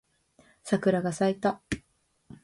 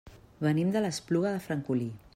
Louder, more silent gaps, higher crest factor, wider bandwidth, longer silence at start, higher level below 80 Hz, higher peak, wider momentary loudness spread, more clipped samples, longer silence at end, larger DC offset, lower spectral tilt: about the same, -28 LUFS vs -30 LUFS; neither; about the same, 18 dB vs 16 dB; second, 11.5 kHz vs 16 kHz; first, 0.65 s vs 0.05 s; first, -56 dBFS vs -62 dBFS; first, -12 dBFS vs -16 dBFS; first, 11 LU vs 5 LU; neither; about the same, 0.1 s vs 0.2 s; neither; about the same, -6 dB/octave vs -6.5 dB/octave